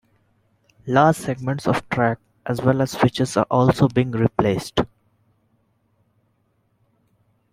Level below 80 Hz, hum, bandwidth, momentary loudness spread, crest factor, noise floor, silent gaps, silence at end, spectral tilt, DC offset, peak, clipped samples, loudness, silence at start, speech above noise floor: -50 dBFS; none; 15.5 kHz; 8 LU; 20 dB; -66 dBFS; none; 2.65 s; -6.5 dB/octave; under 0.1%; -2 dBFS; under 0.1%; -20 LUFS; 0.85 s; 47 dB